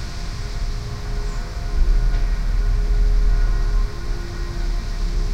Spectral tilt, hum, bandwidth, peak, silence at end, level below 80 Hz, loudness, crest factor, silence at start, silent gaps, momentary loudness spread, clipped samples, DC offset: -5.5 dB/octave; none; 8.4 kHz; -6 dBFS; 0 s; -20 dBFS; -25 LUFS; 14 dB; 0 s; none; 8 LU; under 0.1%; under 0.1%